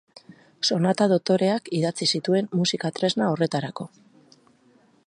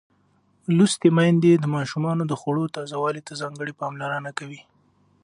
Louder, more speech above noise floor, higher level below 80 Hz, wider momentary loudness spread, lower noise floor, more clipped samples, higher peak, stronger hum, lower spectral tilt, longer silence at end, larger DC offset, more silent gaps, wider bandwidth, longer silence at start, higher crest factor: about the same, -23 LUFS vs -23 LUFS; second, 36 dB vs 41 dB; about the same, -70 dBFS vs -68 dBFS; second, 7 LU vs 15 LU; second, -59 dBFS vs -63 dBFS; neither; second, -8 dBFS vs -4 dBFS; neither; about the same, -5 dB/octave vs -6 dB/octave; first, 1.2 s vs 0.65 s; neither; neither; about the same, 10.5 kHz vs 11 kHz; second, 0.3 s vs 0.7 s; about the same, 18 dB vs 18 dB